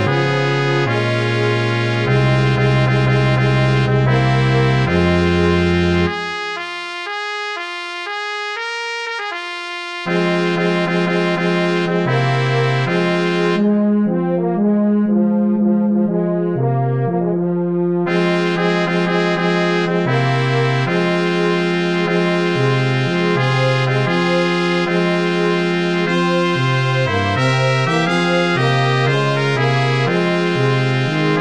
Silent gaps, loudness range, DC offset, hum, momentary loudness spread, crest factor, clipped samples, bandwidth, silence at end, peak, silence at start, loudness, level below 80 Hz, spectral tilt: none; 4 LU; 0.5%; none; 7 LU; 16 dB; under 0.1%; 9.6 kHz; 0 s; 0 dBFS; 0 s; -16 LUFS; -44 dBFS; -6.5 dB/octave